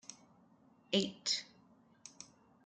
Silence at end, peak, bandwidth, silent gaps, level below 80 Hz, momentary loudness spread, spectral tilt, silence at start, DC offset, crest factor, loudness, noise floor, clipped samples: 0.4 s; -20 dBFS; 9.6 kHz; none; -82 dBFS; 22 LU; -3 dB/octave; 0.1 s; under 0.1%; 24 dB; -36 LUFS; -67 dBFS; under 0.1%